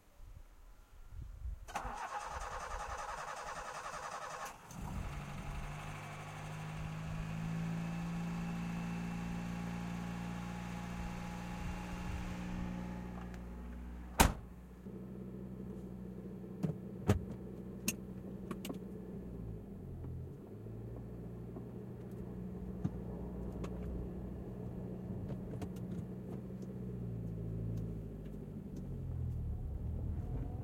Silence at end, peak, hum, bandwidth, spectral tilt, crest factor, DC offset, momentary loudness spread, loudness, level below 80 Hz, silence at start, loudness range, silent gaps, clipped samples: 0 s; -10 dBFS; none; 16.5 kHz; -5.5 dB/octave; 32 dB; under 0.1%; 8 LU; -43 LUFS; -50 dBFS; 0.05 s; 6 LU; none; under 0.1%